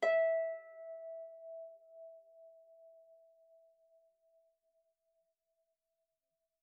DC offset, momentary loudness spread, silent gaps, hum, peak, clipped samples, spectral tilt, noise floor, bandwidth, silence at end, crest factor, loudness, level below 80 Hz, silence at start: under 0.1%; 29 LU; none; none; -22 dBFS; under 0.1%; 7 dB/octave; -89 dBFS; 3.3 kHz; 3.7 s; 20 dB; -39 LUFS; under -90 dBFS; 0 s